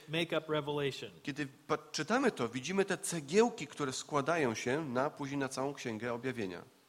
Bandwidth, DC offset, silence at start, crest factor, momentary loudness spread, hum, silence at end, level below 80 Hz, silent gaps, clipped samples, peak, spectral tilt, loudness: 16 kHz; under 0.1%; 0 s; 20 dB; 9 LU; none; 0.25 s; -74 dBFS; none; under 0.1%; -16 dBFS; -4.5 dB/octave; -35 LUFS